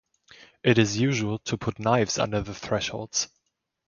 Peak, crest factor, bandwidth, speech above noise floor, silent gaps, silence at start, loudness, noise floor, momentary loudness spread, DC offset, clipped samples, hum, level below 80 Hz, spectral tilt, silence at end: -6 dBFS; 22 dB; 7.4 kHz; 53 dB; none; 0.4 s; -26 LUFS; -79 dBFS; 8 LU; under 0.1%; under 0.1%; none; -52 dBFS; -4.5 dB/octave; 0.6 s